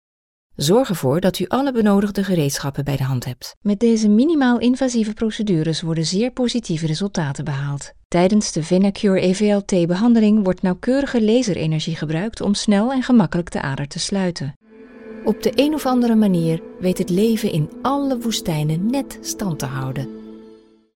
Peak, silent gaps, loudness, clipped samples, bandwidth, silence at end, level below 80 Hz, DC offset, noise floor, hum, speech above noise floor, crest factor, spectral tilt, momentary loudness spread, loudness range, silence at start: -2 dBFS; 3.57-3.61 s, 8.05-8.10 s, 14.56-14.61 s; -19 LUFS; under 0.1%; 16.5 kHz; 0.4 s; -46 dBFS; under 0.1%; -47 dBFS; none; 29 dB; 16 dB; -6 dB/octave; 9 LU; 4 LU; 0.6 s